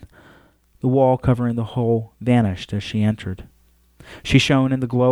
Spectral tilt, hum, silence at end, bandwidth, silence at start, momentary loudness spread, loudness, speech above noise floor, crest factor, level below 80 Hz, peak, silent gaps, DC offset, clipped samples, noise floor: -7 dB/octave; none; 0 s; 12 kHz; 0 s; 11 LU; -20 LUFS; 35 dB; 18 dB; -42 dBFS; -2 dBFS; none; under 0.1%; under 0.1%; -54 dBFS